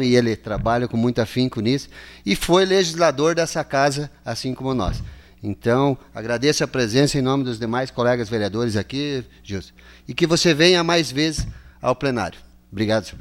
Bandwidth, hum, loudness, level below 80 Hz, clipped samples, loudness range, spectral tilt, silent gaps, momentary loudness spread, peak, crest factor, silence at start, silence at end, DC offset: 16.5 kHz; none; -20 LUFS; -40 dBFS; under 0.1%; 3 LU; -5 dB/octave; none; 14 LU; -2 dBFS; 18 dB; 0 s; 0 s; under 0.1%